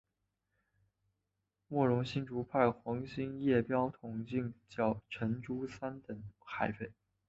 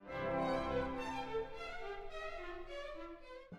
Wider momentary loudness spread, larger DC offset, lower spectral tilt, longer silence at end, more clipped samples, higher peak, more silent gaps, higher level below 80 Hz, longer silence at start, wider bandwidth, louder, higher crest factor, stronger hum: about the same, 13 LU vs 12 LU; neither; about the same, -6.5 dB/octave vs -6 dB/octave; first, 0.35 s vs 0 s; neither; first, -14 dBFS vs -24 dBFS; neither; second, -66 dBFS vs -54 dBFS; first, 1.7 s vs 0 s; second, 7.6 kHz vs 12.5 kHz; first, -36 LUFS vs -42 LUFS; about the same, 22 dB vs 18 dB; neither